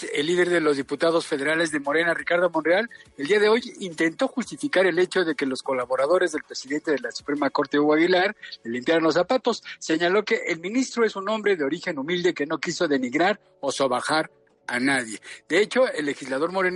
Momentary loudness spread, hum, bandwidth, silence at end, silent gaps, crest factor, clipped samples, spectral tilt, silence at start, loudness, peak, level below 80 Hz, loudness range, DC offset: 9 LU; none; 11.5 kHz; 0 s; none; 16 dB; under 0.1%; -4 dB/octave; 0 s; -23 LUFS; -8 dBFS; -70 dBFS; 2 LU; under 0.1%